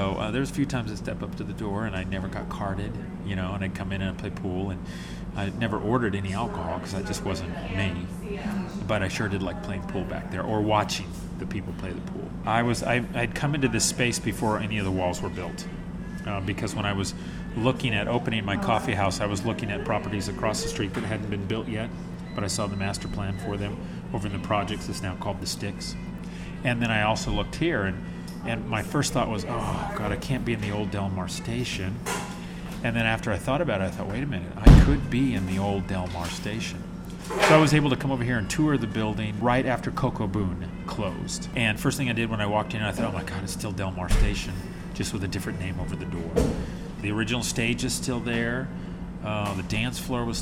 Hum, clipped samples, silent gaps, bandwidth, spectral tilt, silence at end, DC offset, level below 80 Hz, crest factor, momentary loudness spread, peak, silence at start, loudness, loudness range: none; under 0.1%; none; 16 kHz; -5 dB/octave; 0 s; under 0.1%; -34 dBFS; 22 dB; 10 LU; -4 dBFS; 0 s; -27 LUFS; 7 LU